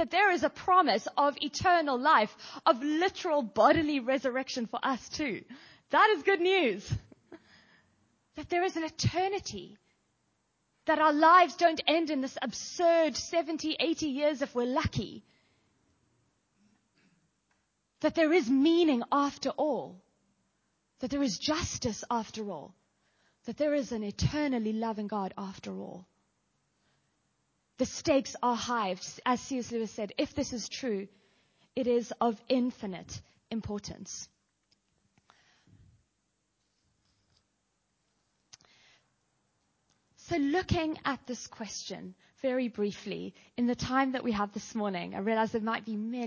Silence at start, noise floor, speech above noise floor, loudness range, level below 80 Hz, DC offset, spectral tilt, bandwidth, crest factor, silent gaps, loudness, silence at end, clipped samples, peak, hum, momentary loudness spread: 0 s; -78 dBFS; 48 dB; 10 LU; -56 dBFS; under 0.1%; -4.5 dB/octave; 7.2 kHz; 22 dB; none; -30 LUFS; 0 s; under 0.1%; -10 dBFS; none; 16 LU